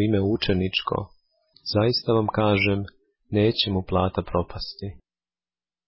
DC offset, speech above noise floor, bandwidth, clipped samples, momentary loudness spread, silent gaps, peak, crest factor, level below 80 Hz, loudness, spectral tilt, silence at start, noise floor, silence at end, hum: under 0.1%; over 67 dB; 5.8 kHz; under 0.1%; 14 LU; none; -8 dBFS; 16 dB; -42 dBFS; -24 LUFS; -10 dB/octave; 0 s; under -90 dBFS; 0.9 s; none